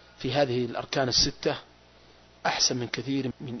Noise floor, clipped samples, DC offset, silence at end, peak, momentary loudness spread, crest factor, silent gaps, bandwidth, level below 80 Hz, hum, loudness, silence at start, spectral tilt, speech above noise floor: -55 dBFS; under 0.1%; under 0.1%; 0 s; -10 dBFS; 9 LU; 20 dB; none; 6.4 kHz; -50 dBFS; 60 Hz at -55 dBFS; -27 LUFS; 0.2 s; -3 dB/octave; 28 dB